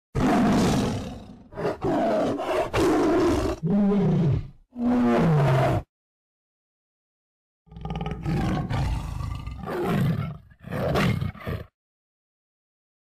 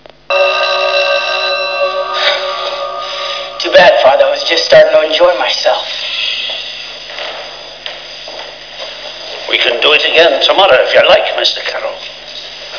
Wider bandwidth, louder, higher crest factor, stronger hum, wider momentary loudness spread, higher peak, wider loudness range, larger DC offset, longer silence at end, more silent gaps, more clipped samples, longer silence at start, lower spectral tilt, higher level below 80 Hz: first, 15 kHz vs 5.4 kHz; second, -24 LUFS vs -10 LUFS; about the same, 8 dB vs 12 dB; neither; second, 14 LU vs 18 LU; second, -16 dBFS vs 0 dBFS; about the same, 9 LU vs 9 LU; second, under 0.1% vs 0.4%; first, 1.4 s vs 0 s; first, 5.89-7.65 s vs none; second, under 0.1% vs 0.9%; second, 0.15 s vs 0.3 s; first, -7 dB/octave vs -1.5 dB/octave; first, -40 dBFS vs -50 dBFS